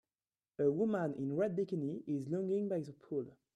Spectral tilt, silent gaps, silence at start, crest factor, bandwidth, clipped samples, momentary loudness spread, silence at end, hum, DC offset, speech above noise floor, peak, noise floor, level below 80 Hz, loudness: -9.5 dB/octave; none; 0.6 s; 16 dB; 9.6 kHz; under 0.1%; 8 LU; 0.25 s; none; under 0.1%; over 54 dB; -22 dBFS; under -90 dBFS; -80 dBFS; -37 LUFS